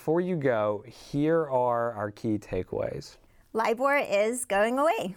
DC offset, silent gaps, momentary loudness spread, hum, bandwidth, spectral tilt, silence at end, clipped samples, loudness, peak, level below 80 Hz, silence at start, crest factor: under 0.1%; none; 10 LU; none; 19 kHz; -5.5 dB/octave; 0 s; under 0.1%; -27 LUFS; -14 dBFS; -58 dBFS; 0 s; 14 dB